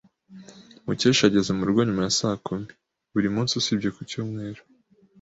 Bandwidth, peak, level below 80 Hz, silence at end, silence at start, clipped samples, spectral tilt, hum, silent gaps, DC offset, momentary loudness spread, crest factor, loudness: 8 kHz; -4 dBFS; -56 dBFS; 0.65 s; 0.3 s; under 0.1%; -4.5 dB/octave; none; none; under 0.1%; 16 LU; 22 dB; -24 LUFS